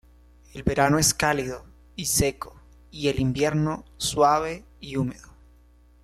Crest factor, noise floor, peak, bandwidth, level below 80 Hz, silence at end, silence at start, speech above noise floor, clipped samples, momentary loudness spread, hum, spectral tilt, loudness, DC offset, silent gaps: 18 dB; -55 dBFS; -8 dBFS; 15.5 kHz; -44 dBFS; 0.8 s; 0.55 s; 31 dB; under 0.1%; 20 LU; 60 Hz at -50 dBFS; -4 dB/octave; -24 LUFS; under 0.1%; none